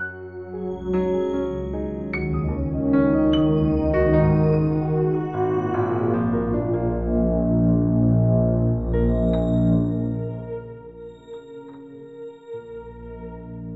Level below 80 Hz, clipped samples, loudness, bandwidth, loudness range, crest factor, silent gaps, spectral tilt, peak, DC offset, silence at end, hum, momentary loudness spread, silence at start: -34 dBFS; under 0.1%; -22 LUFS; 5.2 kHz; 8 LU; 14 dB; none; -10.5 dB/octave; -6 dBFS; under 0.1%; 0 s; none; 20 LU; 0 s